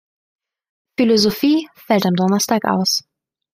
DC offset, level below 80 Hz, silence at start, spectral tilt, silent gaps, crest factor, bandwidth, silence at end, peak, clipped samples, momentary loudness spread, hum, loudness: under 0.1%; -60 dBFS; 1 s; -4.5 dB/octave; none; 16 dB; 16 kHz; 0.55 s; -2 dBFS; under 0.1%; 6 LU; none; -17 LUFS